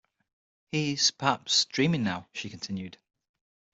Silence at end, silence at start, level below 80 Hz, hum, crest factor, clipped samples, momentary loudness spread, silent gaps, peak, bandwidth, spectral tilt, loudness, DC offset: 0.85 s; 0.75 s; -68 dBFS; none; 22 dB; under 0.1%; 13 LU; none; -8 dBFS; 8.2 kHz; -3.5 dB/octave; -27 LUFS; under 0.1%